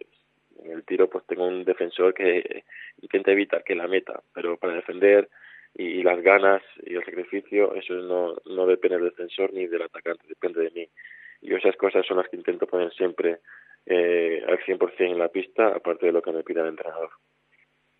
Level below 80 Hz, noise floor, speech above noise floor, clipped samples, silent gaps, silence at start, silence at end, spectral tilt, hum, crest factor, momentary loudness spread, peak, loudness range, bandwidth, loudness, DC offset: -86 dBFS; -65 dBFS; 41 dB; under 0.1%; none; 0.65 s; 0.9 s; -8 dB/octave; none; 22 dB; 14 LU; -2 dBFS; 4 LU; 4.1 kHz; -24 LUFS; under 0.1%